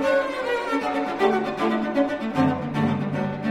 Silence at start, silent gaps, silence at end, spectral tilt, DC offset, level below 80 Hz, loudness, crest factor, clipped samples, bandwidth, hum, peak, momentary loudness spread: 0 s; none; 0 s; -7 dB/octave; under 0.1%; -56 dBFS; -24 LUFS; 16 dB; under 0.1%; 13 kHz; none; -8 dBFS; 4 LU